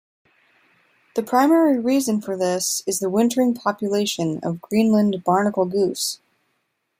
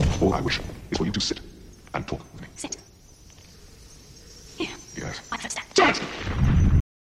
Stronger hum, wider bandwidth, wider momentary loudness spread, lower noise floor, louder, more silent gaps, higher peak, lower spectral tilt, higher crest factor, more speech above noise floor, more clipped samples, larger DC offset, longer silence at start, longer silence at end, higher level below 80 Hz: neither; first, 16 kHz vs 13.5 kHz; second, 8 LU vs 23 LU; first, -72 dBFS vs -50 dBFS; first, -20 LUFS vs -26 LUFS; neither; about the same, -4 dBFS vs -4 dBFS; about the same, -4.5 dB/octave vs -5 dB/octave; second, 16 dB vs 22 dB; first, 52 dB vs 23 dB; neither; neither; first, 1.15 s vs 0 s; first, 0.85 s vs 0.4 s; second, -66 dBFS vs -34 dBFS